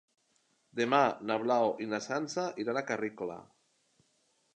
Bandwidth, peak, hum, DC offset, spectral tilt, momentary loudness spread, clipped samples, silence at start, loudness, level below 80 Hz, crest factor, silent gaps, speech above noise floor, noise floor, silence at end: 9.8 kHz; -10 dBFS; none; under 0.1%; -4.5 dB/octave; 14 LU; under 0.1%; 0.75 s; -32 LUFS; -80 dBFS; 24 dB; none; 42 dB; -74 dBFS; 1.1 s